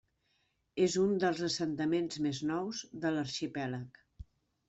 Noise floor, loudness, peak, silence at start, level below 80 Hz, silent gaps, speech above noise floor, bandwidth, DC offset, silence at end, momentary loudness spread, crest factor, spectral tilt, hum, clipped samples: -77 dBFS; -34 LUFS; -16 dBFS; 0.75 s; -64 dBFS; none; 44 dB; 8.2 kHz; under 0.1%; 0.45 s; 10 LU; 18 dB; -5 dB/octave; none; under 0.1%